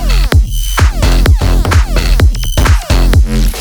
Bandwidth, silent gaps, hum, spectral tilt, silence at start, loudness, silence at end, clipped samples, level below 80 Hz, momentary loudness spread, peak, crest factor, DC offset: over 20 kHz; none; none; -5 dB/octave; 0 s; -11 LUFS; 0 s; under 0.1%; -10 dBFS; 3 LU; 0 dBFS; 8 dB; under 0.1%